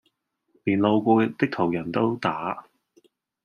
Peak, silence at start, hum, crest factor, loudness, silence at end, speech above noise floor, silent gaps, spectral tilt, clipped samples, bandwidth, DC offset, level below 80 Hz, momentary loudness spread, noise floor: -6 dBFS; 0.65 s; none; 20 dB; -24 LUFS; 0.85 s; 49 dB; none; -8 dB/octave; under 0.1%; 6.8 kHz; under 0.1%; -66 dBFS; 11 LU; -72 dBFS